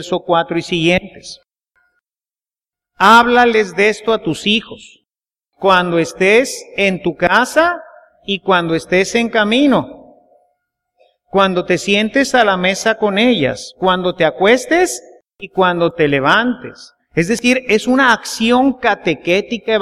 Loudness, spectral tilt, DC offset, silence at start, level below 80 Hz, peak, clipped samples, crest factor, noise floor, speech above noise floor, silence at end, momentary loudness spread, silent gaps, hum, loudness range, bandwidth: -14 LUFS; -4.5 dB/octave; under 0.1%; 0 s; -48 dBFS; 0 dBFS; under 0.1%; 16 dB; under -90 dBFS; over 76 dB; 0 s; 9 LU; none; none; 2 LU; 15 kHz